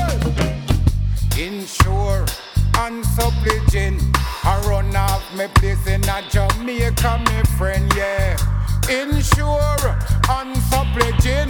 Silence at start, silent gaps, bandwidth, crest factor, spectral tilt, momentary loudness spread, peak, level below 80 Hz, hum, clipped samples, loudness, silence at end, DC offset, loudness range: 0 s; none; 19 kHz; 16 dB; -5 dB/octave; 4 LU; -2 dBFS; -20 dBFS; none; under 0.1%; -19 LUFS; 0 s; under 0.1%; 1 LU